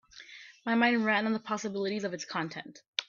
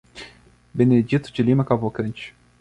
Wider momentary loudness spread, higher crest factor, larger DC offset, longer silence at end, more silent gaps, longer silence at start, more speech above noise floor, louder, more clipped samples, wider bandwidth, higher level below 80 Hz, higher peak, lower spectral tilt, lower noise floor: about the same, 20 LU vs 21 LU; about the same, 22 dB vs 18 dB; neither; second, 0.05 s vs 0.3 s; first, 2.88-2.93 s vs none; about the same, 0.15 s vs 0.15 s; second, 21 dB vs 30 dB; second, -30 LUFS vs -21 LUFS; neither; second, 7.4 kHz vs 9.6 kHz; second, -76 dBFS vs -54 dBFS; second, -10 dBFS vs -4 dBFS; second, -4 dB/octave vs -8.5 dB/octave; about the same, -51 dBFS vs -50 dBFS